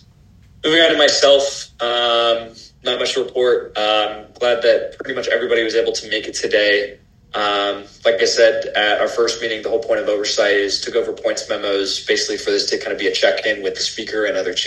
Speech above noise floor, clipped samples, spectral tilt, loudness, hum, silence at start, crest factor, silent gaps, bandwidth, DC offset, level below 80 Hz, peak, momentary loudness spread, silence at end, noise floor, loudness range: 30 dB; under 0.1%; -1.5 dB/octave; -17 LUFS; none; 0.65 s; 18 dB; none; 11.5 kHz; under 0.1%; -54 dBFS; 0 dBFS; 9 LU; 0 s; -48 dBFS; 3 LU